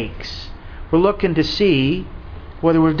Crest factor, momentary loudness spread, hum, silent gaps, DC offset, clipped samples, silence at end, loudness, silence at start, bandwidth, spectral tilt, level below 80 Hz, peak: 16 dB; 20 LU; none; none; under 0.1%; under 0.1%; 0 s; -18 LUFS; 0 s; 5.4 kHz; -7.5 dB/octave; -34 dBFS; -4 dBFS